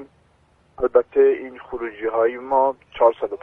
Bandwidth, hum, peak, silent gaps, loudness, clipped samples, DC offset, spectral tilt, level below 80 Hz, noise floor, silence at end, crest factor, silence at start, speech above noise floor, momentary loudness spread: 3.7 kHz; none; -2 dBFS; none; -20 LUFS; under 0.1%; under 0.1%; -7.5 dB/octave; -54 dBFS; -59 dBFS; 0.05 s; 20 dB; 0 s; 39 dB; 12 LU